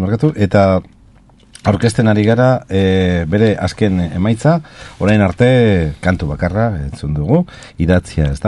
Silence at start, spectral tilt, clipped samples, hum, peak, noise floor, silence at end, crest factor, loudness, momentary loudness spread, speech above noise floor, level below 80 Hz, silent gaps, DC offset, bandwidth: 0 s; -7.5 dB/octave; under 0.1%; none; 0 dBFS; -45 dBFS; 0 s; 14 dB; -14 LUFS; 7 LU; 32 dB; -32 dBFS; none; under 0.1%; 11.5 kHz